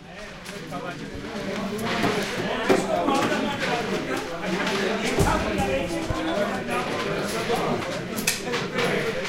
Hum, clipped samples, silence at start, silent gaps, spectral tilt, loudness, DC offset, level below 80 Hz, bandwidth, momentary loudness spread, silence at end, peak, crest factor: none; under 0.1%; 0 s; none; -4 dB/octave; -25 LUFS; under 0.1%; -42 dBFS; 16.5 kHz; 11 LU; 0 s; -6 dBFS; 20 dB